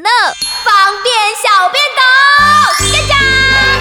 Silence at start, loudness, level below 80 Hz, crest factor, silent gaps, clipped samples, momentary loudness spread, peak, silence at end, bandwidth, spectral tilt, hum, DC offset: 0 s; -8 LUFS; -30 dBFS; 10 dB; none; under 0.1%; 5 LU; 0 dBFS; 0 s; 19 kHz; -1.5 dB/octave; none; under 0.1%